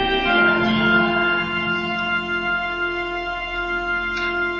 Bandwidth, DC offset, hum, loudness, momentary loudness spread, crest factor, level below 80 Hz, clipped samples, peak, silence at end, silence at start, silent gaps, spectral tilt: 7.4 kHz; under 0.1%; none; -20 LUFS; 8 LU; 16 dB; -42 dBFS; under 0.1%; -4 dBFS; 0 s; 0 s; none; -5.5 dB/octave